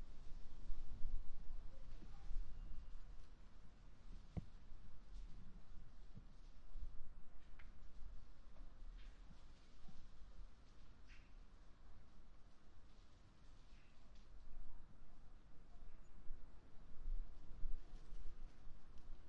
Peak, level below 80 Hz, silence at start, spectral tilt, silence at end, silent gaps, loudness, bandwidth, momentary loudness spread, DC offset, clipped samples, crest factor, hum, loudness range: -26 dBFS; -52 dBFS; 0 s; -6.5 dB/octave; 0 s; none; -62 LUFS; 5 kHz; 13 LU; under 0.1%; under 0.1%; 18 dB; none; 9 LU